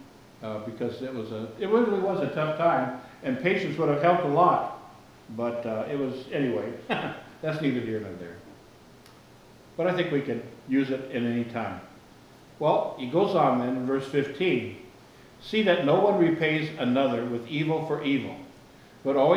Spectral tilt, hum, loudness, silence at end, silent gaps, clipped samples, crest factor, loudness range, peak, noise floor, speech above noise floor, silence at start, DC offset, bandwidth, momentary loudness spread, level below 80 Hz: -7 dB/octave; none; -27 LUFS; 0 s; none; under 0.1%; 20 dB; 6 LU; -8 dBFS; -52 dBFS; 26 dB; 0 s; under 0.1%; 19 kHz; 14 LU; -66 dBFS